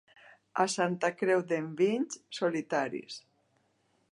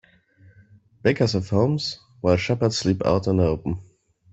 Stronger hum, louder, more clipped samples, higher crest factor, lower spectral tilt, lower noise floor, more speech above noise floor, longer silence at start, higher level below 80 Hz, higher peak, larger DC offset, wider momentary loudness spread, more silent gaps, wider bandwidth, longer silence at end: neither; second, -31 LUFS vs -23 LUFS; neither; about the same, 20 dB vs 20 dB; second, -4.5 dB/octave vs -6 dB/octave; first, -73 dBFS vs -54 dBFS; first, 42 dB vs 33 dB; second, 0.55 s vs 1.05 s; second, -84 dBFS vs -48 dBFS; second, -14 dBFS vs -4 dBFS; neither; about the same, 10 LU vs 8 LU; neither; first, 11.5 kHz vs 8.2 kHz; first, 0.95 s vs 0.5 s